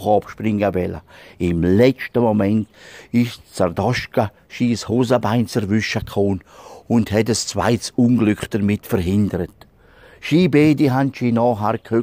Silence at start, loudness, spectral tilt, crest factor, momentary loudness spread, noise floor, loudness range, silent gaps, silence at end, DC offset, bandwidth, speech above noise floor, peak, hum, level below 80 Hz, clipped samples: 0 s; -19 LUFS; -6.5 dB/octave; 16 dB; 8 LU; -47 dBFS; 2 LU; none; 0 s; under 0.1%; 16 kHz; 29 dB; -2 dBFS; none; -46 dBFS; under 0.1%